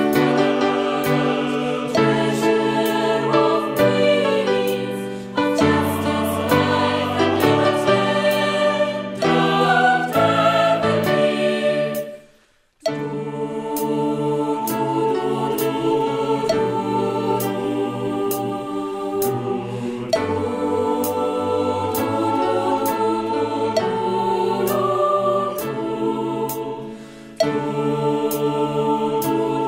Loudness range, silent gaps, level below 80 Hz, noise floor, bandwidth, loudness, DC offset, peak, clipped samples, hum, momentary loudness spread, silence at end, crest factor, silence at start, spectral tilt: 5 LU; none; -56 dBFS; -57 dBFS; 16.5 kHz; -20 LUFS; under 0.1%; -2 dBFS; under 0.1%; none; 8 LU; 0 s; 18 dB; 0 s; -5.5 dB/octave